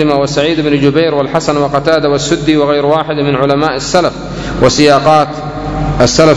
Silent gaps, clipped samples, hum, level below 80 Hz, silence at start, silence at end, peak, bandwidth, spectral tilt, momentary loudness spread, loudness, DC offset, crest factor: none; 1%; none; -30 dBFS; 0 s; 0 s; 0 dBFS; 11 kHz; -5 dB/octave; 9 LU; -11 LUFS; under 0.1%; 10 dB